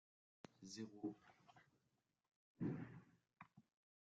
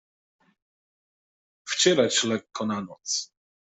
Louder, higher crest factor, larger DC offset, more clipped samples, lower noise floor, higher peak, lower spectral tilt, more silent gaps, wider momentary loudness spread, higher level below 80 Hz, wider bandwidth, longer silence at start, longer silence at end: second, -52 LUFS vs -25 LUFS; about the same, 20 dB vs 22 dB; neither; neither; about the same, -88 dBFS vs under -90 dBFS; second, -36 dBFS vs -6 dBFS; first, -6.5 dB/octave vs -2.5 dB/octave; first, 2.36-2.55 s vs none; first, 19 LU vs 13 LU; second, -86 dBFS vs -72 dBFS; second, 7.4 kHz vs 8.2 kHz; second, 0.6 s vs 1.65 s; about the same, 0.4 s vs 0.35 s